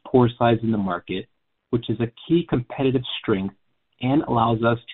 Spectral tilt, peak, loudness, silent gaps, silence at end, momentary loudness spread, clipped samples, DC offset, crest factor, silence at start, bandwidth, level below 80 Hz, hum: -6 dB/octave; -4 dBFS; -23 LUFS; none; 0 s; 9 LU; under 0.1%; under 0.1%; 18 dB; 0.05 s; 4.2 kHz; -50 dBFS; none